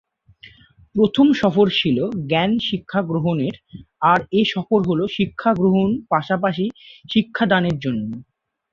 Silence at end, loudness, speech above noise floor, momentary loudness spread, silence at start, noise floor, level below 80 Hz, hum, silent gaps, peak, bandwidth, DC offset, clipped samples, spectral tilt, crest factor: 0.5 s; -19 LUFS; 30 dB; 9 LU; 0.45 s; -49 dBFS; -54 dBFS; none; none; -2 dBFS; 7.2 kHz; under 0.1%; under 0.1%; -7.5 dB/octave; 18 dB